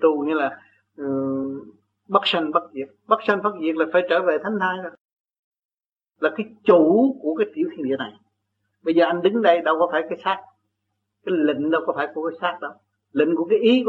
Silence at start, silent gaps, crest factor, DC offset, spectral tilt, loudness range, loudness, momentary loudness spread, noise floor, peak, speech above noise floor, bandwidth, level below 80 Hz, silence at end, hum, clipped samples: 0 s; 5.01-5.25 s, 5.39-5.52 s, 5.65-5.69 s, 5.86-5.96 s; 20 dB; under 0.1%; -7 dB/octave; 3 LU; -21 LUFS; 13 LU; -86 dBFS; -2 dBFS; 66 dB; 7.4 kHz; -72 dBFS; 0 s; none; under 0.1%